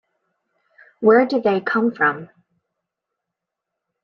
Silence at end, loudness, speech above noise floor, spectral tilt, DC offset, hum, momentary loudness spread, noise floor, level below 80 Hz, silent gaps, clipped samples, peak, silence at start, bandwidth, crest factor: 1.8 s; -18 LUFS; 66 dB; -7.5 dB/octave; under 0.1%; none; 5 LU; -83 dBFS; -68 dBFS; none; under 0.1%; -4 dBFS; 1 s; 6 kHz; 18 dB